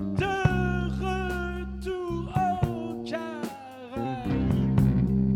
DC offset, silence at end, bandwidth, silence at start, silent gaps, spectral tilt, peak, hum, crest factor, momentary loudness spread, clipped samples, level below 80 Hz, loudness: under 0.1%; 0 s; 14 kHz; 0 s; none; -8 dB/octave; -6 dBFS; none; 20 dB; 11 LU; under 0.1%; -38 dBFS; -28 LUFS